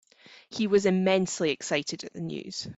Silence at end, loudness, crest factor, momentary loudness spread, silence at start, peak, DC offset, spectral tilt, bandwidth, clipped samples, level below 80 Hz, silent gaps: 0.05 s; -27 LUFS; 18 dB; 13 LU; 0.3 s; -10 dBFS; under 0.1%; -4.5 dB/octave; 8 kHz; under 0.1%; -66 dBFS; none